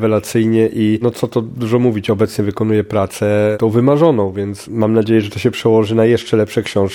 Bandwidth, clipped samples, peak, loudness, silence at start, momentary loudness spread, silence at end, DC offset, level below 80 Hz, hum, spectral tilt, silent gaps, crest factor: 17.5 kHz; under 0.1%; 0 dBFS; -15 LUFS; 0 s; 6 LU; 0 s; under 0.1%; -52 dBFS; none; -7 dB/octave; none; 14 dB